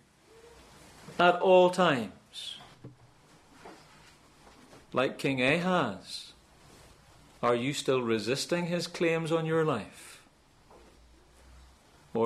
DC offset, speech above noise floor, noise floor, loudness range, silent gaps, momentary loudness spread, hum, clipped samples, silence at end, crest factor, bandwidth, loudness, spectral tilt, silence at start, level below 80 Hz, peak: under 0.1%; 33 dB; -61 dBFS; 7 LU; none; 21 LU; none; under 0.1%; 0 s; 22 dB; 14 kHz; -28 LUFS; -5 dB/octave; 1.05 s; -64 dBFS; -10 dBFS